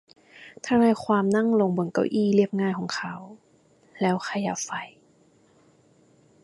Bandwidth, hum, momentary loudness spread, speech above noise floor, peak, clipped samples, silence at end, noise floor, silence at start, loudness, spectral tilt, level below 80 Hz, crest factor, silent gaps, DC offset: 11.5 kHz; none; 14 LU; 36 dB; -8 dBFS; under 0.1%; 1.55 s; -60 dBFS; 0.35 s; -24 LUFS; -6 dB/octave; -66 dBFS; 18 dB; none; under 0.1%